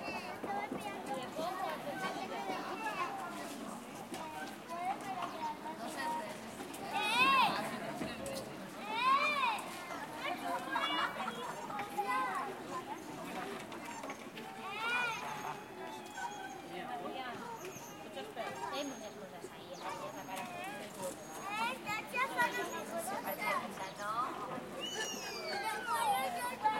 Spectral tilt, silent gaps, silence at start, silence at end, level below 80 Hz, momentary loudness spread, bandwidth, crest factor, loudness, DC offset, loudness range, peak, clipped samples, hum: -2.5 dB/octave; none; 0 s; 0 s; -74 dBFS; 12 LU; 16.5 kHz; 20 dB; -38 LUFS; under 0.1%; 9 LU; -18 dBFS; under 0.1%; none